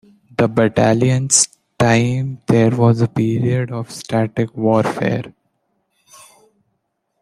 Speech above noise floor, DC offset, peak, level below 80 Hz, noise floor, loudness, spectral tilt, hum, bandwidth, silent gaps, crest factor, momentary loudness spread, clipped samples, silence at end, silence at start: 55 dB; under 0.1%; 0 dBFS; -52 dBFS; -71 dBFS; -16 LUFS; -5 dB/octave; none; 13 kHz; none; 18 dB; 9 LU; under 0.1%; 1.9 s; 0.4 s